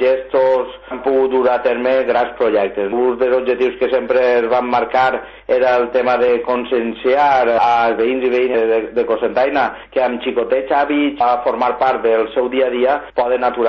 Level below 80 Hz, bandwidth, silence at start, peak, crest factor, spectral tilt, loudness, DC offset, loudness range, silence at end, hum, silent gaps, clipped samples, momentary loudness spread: -50 dBFS; 6.4 kHz; 0 s; -6 dBFS; 10 dB; -6 dB/octave; -16 LUFS; under 0.1%; 2 LU; 0 s; none; none; under 0.1%; 4 LU